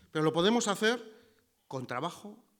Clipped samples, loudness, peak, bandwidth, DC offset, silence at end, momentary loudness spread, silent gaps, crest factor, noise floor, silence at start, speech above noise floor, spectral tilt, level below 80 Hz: under 0.1%; -30 LUFS; -14 dBFS; 19 kHz; under 0.1%; 0.25 s; 15 LU; none; 18 dB; -67 dBFS; 0.15 s; 36 dB; -4 dB/octave; -72 dBFS